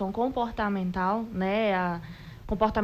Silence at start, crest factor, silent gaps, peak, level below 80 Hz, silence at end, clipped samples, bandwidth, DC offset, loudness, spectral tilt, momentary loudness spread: 0 s; 16 dB; none; -12 dBFS; -46 dBFS; 0 s; under 0.1%; 14.5 kHz; under 0.1%; -28 LUFS; -8 dB/octave; 11 LU